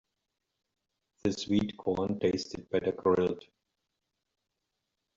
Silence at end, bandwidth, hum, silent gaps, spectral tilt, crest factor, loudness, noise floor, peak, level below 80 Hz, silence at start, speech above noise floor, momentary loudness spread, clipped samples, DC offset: 1.75 s; 7.6 kHz; none; none; -6 dB/octave; 20 dB; -31 LUFS; -85 dBFS; -14 dBFS; -64 dBFS; 1.25 s; 54 dB; 7 LU; under 0.1%; under 0.1%